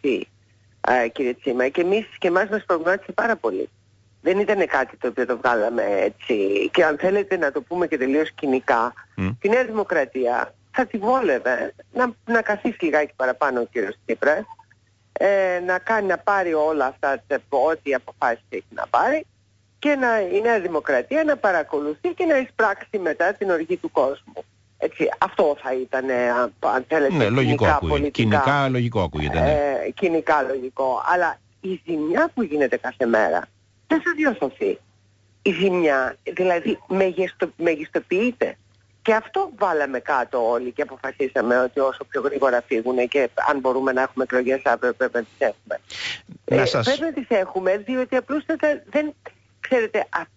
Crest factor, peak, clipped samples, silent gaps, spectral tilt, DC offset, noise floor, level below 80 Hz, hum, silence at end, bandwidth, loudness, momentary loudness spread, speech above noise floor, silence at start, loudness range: 16 dB; -6 dBFS; under 0.1%; none; -6.5 dB/octave; under 0.1%; -60 dBFS; -48 dBFS; none; 0.1 s; 8 kHz; -22 LUFS; 7 LU; 39 dB; 0.05 s; 3 LU